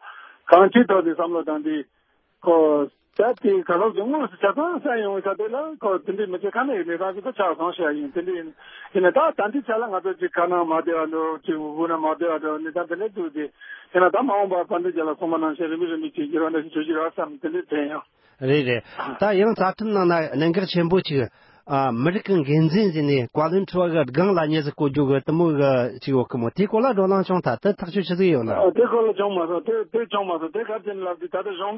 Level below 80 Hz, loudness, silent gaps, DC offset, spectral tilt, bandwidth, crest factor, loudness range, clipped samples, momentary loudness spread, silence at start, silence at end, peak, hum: -62 dBFS; -22 LUFS; none; under 0.1%; -11 dB/octave; 5.8 kHz; 22 dB; 4 LU; under 0.1%; 9 LU; 0.05 s; 0 s; 0 dBFS; none